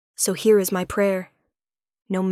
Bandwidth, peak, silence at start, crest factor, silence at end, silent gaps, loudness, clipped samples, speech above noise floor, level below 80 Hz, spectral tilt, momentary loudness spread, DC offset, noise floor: 16 kHz; -6 dBFS; 0.2 s; 16 dB; 0 s; none; -21 LUFS; under 0.1%; over 70 dB; -56 dBFS; -4.5 dB/octave; 10 LU; under 0.1%; under -90 dBFS